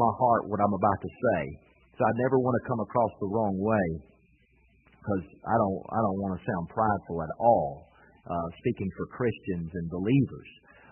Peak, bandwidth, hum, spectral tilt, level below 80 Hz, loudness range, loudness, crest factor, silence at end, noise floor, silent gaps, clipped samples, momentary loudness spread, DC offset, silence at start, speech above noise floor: -10 dBFS; 3.2 kHz; none; -12 dB/octave; -58 dBFS; 3 LU; -28 LUFS; 20 dB; 0.4 s; -64 dBFS; none; under 0.1%; 10 LU; under 0.1%; 0 s; 36 dB